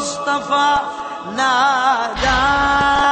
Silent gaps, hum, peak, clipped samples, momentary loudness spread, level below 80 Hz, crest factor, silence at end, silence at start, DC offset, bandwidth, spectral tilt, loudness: none; none; -4 dBFS; under 0.1%; 8 LU; -36 dBFS; 12 dB; 0 s; 0 s; under 0.1%; 8.8 kHz; -2.5 dB/octave; -16 LUFS